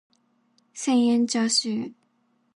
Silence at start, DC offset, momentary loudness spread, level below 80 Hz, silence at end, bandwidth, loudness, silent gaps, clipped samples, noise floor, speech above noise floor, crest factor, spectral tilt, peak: 0.75 s; under 0.1%; 15 LU; -78 dBFS; 0.65 s; 11 kHz; -23 LUFS; none; under 0.1%; -68 dBFS; 46 dB; 16 dB; -3 dB/octave; -10 dBFS